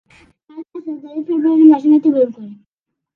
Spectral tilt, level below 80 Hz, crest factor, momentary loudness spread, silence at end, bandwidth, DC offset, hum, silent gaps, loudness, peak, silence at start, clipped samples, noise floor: -9 dB/octave; -68 dBFS; 16 dB; 21 LU; 0.6 s; 4 kHz; under 0.1%; none; none; -13 LUFS; 0 dBFS; 0.55 s; under 0.1%; -80 dBFS